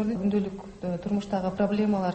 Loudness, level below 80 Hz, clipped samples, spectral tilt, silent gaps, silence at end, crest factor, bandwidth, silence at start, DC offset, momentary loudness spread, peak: -28 LUFS; -54 dBFS; under 0.1%; -8 dB/octave; none; 0 s; 14 dB; 8.4 kHz; 0 s; under 0.1%; 9 LU; -12 dBFS